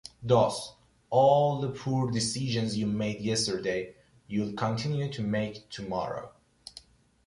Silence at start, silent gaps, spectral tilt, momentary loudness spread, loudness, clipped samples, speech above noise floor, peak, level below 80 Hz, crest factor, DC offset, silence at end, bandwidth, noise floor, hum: 0.2 s; none; -5.5 dB/octave; 18 LU; -29 LUFS; under 0.1%; 26 dB; -10 dBFS; -60 dBFS; 18 dB; under 0.1%; 0.5 s; 11.5 kHz; -54 dBFS; none